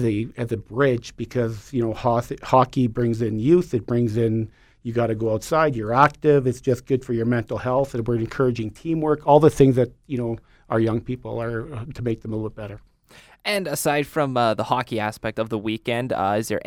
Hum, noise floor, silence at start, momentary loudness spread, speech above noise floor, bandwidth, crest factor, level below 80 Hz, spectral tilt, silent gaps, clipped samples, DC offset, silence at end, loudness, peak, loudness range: none; -51 dBFS; 0 s; 11 LU; 29 dB; 17 kHz; 20 dB; -48 dBFS; -6.5 dB/octave; none; under 0.1%; under 0.1%; 0.05 s; -22 LUFS; -2 dBFS; 6 LU